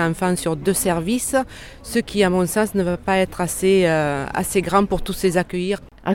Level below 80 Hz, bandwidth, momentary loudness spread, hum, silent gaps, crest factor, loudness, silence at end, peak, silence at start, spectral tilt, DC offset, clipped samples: -40 dBFS; 17 kHz; 7 LU; none; none; 16 dB; -20 LUFS; 0 s; -4 dBFS; 0 s; -5 dB/octave; under 0.1%; under 0.1%